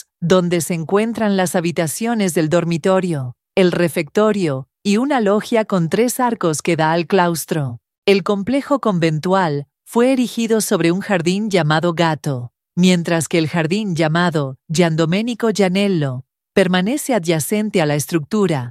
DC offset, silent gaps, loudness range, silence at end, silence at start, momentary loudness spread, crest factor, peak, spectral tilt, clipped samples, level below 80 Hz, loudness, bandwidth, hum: under 0.1%; 7.98-8.02 s; 1 LU; 0 s; 0.2 s; 6 LU; 16 dB; 0 dBFS; -5.5 dB/octave; under 0.1%; -58 dBFS; -17 LUFS; 15.5 kHz; none